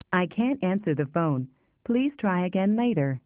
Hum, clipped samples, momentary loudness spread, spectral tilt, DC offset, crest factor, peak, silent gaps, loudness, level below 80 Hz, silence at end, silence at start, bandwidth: none; under 0.1%; 5 LU; -7 dB/octave; under 0.1%; 16 dB; -10 dBFS; none; -26 LUFS; -64 dBFS; 0.05 s; 0.1 s; 4 kHz